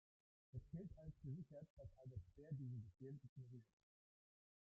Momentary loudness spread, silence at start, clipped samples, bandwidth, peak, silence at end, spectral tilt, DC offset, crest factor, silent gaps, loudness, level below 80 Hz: 8 LU; 0.55 s; under 0.1%; 6 kHz; -42 dBFS; 1 s; -11.5 dB/octave; under 0.1%; 16 dB; 1.70-1.77 s, 3.29-3.36 s; -57 LUFS; -72 dBFS